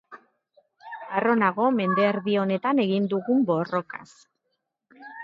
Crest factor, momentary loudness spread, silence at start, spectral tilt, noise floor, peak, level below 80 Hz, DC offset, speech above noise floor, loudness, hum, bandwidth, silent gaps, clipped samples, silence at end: 18 dB; 18 LU; 0.1 s; -8 dB/octave; -78 dBFS; -8 dBFS; -74 dBFS; under 0.1%; 55 dB; -24 LUFS; none; 7.6 kHz; none; under 0.1%; 0 s